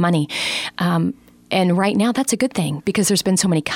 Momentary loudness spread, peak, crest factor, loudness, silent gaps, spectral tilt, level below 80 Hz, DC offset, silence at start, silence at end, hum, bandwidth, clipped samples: 5 LU; -4 dBFS; 14 dB; -19 LUFS; none; -4.5 dB/octave; -56 dBFS; under 0.1%; 0 s; 0 s; none; 16.5 kHz; under 0.1%